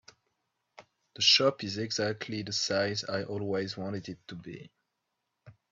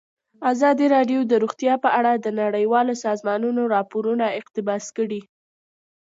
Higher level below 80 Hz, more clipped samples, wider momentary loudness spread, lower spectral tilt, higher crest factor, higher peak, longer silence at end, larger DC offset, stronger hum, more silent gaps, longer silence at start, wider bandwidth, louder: about the same, -72 dBFS vs -76 dBFS; neither; first, 22 LU vs 8 LU; second, -3 dB/octave vs -5 dB/octave; first, 24 dB vs 16 dB; about the same, -8 dBFS vs -6 dBFS; second, 0.2 s vs 0.8 s; neither; neither; neither; first, 0.8 s vs 0.4 s; about the same, 8 kHz vs 7.8 kHz; second, -29 LUFS vs -21 LUFS